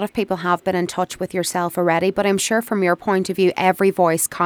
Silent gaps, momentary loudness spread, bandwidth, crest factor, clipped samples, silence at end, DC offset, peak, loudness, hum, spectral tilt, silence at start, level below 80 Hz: none; 6 LU; 20 kHz; 16 dB; under 0.1%; 0 s; under 0.1%; -2 dBFS; -19 LUFS; none; -4.5 dB/octave; 0 s; -58 dBFS